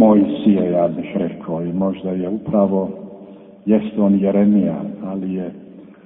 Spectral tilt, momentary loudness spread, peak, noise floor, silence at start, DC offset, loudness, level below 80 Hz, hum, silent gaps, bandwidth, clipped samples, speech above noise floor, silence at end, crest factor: -13.5 dB/octave; 14 LU; 0 dBFS; -40 dBFS; 0 s; under 0.1%; -18 LUFS; -54 dBFS; none; none; 3.8 kHz; under 0.1%; 22 dB; 0.2 s; 18 dB